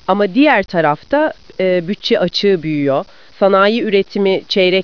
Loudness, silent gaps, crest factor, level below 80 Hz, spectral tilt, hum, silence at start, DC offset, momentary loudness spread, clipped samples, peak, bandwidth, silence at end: -14 LUFS; none; 14 dB; -52 dBFS; -6.5 dB/octave; none; 0.1 s; 0.7%; 6 LU; under 0.1%; 0 dBFS; 5.4 kHz; 0 s